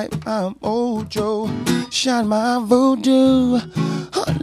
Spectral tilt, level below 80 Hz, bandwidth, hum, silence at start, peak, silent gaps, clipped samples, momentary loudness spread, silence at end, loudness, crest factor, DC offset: -5.5 dB/octave; -48 dBFS; 15 kHz; none; 0 s; -2 dBFS; none; under 0.1%; 8 LU; 0 s; -19 LUFS; 16 dB; under 0.1%